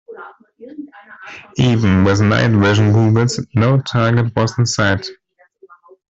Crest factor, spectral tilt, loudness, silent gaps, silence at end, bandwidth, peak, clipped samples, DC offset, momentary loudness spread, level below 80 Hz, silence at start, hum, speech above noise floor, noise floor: 14 dB; -6 dB/octave; -15 LUFS; none; 0.95 s; 8 kHz; -2 dBFS; under 0.1%; under 0.1%; 22 LU; -46 dBFS; 0.1 s; none; 36 dB; -50 dBFS